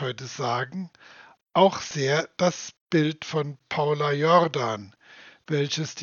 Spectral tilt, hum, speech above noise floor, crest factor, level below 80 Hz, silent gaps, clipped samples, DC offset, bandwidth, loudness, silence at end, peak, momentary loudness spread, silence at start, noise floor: -5 dB/octave; none; 26 dB; 20 dB; -72 dBFS; 2.81-2.86 s; under 0.1%; under 0.1%; 7.2 kHz; -25 LUFS; 0 s; -4 dBFS; 12 LU; 0 s; -51 dBFS